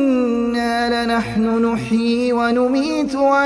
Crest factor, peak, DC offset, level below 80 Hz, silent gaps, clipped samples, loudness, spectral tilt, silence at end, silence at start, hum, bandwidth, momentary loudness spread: 12 dB; -4 dBFS; under 0.1%; -46 dBFS; none; under 0.1%; -18 LUFS; -5.5 dB/octave; 0 s; 0 s; none; 11 kHz; 2 LU